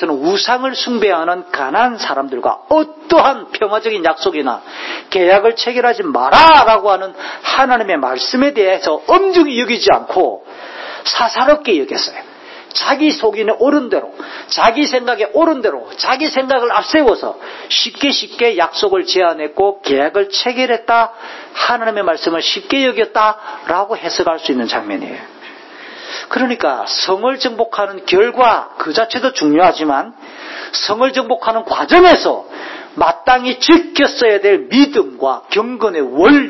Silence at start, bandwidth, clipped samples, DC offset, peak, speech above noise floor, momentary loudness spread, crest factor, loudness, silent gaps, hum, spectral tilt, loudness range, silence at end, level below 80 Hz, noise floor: 0 s; 8 kHz; under 0.1%; under 0.1%; 0 dBFS; 22 dB; 12 LU; 14 dB; -13 LUFS; none; none; -3 dB/octave; 5 LU; 0 s; -48 dBFS; -35 dBFS